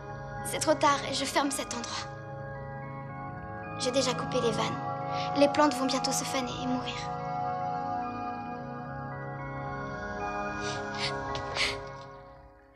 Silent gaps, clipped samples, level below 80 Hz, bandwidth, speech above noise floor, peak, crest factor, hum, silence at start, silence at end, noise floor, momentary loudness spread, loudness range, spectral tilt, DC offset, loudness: none; under 0.1%; -54 dBFS; 13.5 kHz; 24 dB; -10 dBFS; 22 dB; none; 0 s; 0.15 s; -52 dBFS; 14 LU; 7 LU; -4 dB/octave; under 0.1%; -31 LUFS